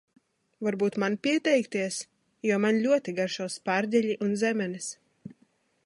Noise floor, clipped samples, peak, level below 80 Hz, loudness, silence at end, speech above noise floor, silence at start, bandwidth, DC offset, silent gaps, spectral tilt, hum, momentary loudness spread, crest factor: -68 dBFS; under 0.1%; -12 dBFS; -78 dBFS; -28 LUFS; 0.55 s; 41 dB; 0.6 s; 11.5 kHz; under 0.1%; none; -4.5 dB/octave; none; 10 LU; 16 dB